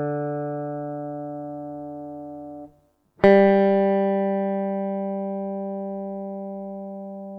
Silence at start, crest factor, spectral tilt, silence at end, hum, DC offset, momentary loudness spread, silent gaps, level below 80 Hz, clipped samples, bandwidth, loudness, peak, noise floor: 0 s; 22 dB; -9.5 dB/octave; 0 s; 50 Hz at -55 dBFS; under 0.1%; 19 LU; none; -60 dBFS; under 0.1%; 5.2 kHz; -23 LUFS; -2 dBFS; -60 dBFS